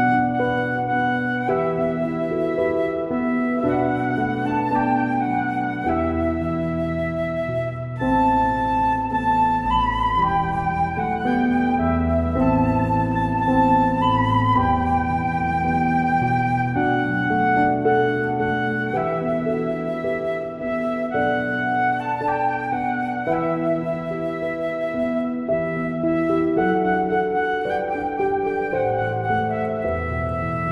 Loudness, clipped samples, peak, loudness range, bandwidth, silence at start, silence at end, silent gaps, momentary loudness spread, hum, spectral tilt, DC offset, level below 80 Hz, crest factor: -21 LUFS; under 0.1%; -6 dBFS; 4 LU; 11 kHz; 0 s; 0 s; none; 6 LU; none; -8.5 dB/octave; under 0.1%; -42 dBFS; 14 dB